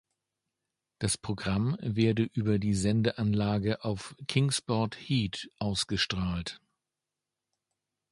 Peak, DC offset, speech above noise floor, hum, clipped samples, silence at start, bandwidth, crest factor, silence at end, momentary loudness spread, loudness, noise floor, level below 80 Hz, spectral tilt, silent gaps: -12 dBFS; under 0.1%; 59 dB; none; under 0.1%; 1 s; 11.5 kHz; 18 dB; 1.55 s; 8 LU; -30 LUFS; -89 dBFS; -52 dBFS; -5 dB/octave; none